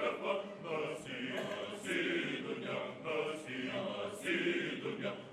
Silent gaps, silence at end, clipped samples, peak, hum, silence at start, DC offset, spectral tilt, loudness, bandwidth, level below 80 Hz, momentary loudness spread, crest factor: none; 0 s; under 0.1%; -22 dBFS; none; 0 s; under 0.1%; -4.5 dB/octave; -38 LUFS; 13.5 kHz; -80 dBFS; 6 LU; 16 dB